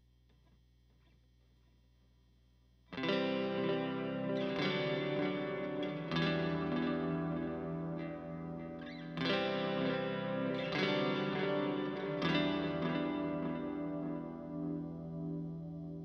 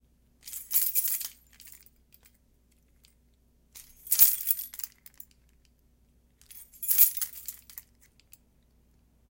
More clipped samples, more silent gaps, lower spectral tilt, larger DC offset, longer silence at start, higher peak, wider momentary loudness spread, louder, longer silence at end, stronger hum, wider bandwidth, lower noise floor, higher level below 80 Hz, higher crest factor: neither; neither; first, -7.5 dB/octave vs 2 dB/octave; neither; first, 2.9 s vs 0.45 s; second, -20 dBFS vs -2 dBFS; second, 10 LU vs 28 LU; second, -37 LUFS vs -24 LUFS; second, 0 s vs 1.5 s; neither; second, 6.6 kHz vs 17 kHz; about the same, -67 dBFS vs -65 dBFS; about the same, -66 dBFS vs -66 dBFS; second, 18 dB vs 30 dB